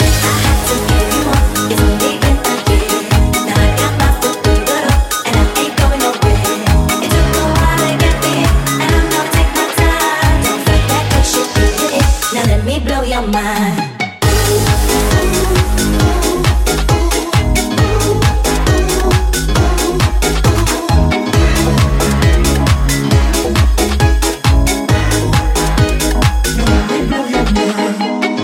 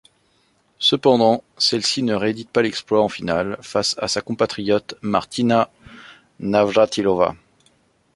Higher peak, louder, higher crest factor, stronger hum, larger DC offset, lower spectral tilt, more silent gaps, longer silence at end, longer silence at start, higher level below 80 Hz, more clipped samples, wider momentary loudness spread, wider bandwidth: about the same, 0 dBFS vs -2 dBFS; first, -13 LUFS vs -19 LUFS; second, 12 dB vs 18 dB; neither; neither; about the same, -4.5 dB/octave vs -4 dB/octave; neither; second, 0 s vs 0.8 s; second, 0 s vs 0.8 s; first, -16 dBFS vs -54 dBFS; neither; second, 2 LU vs 7 LU; first, 17 kHz vs 11.5 kHz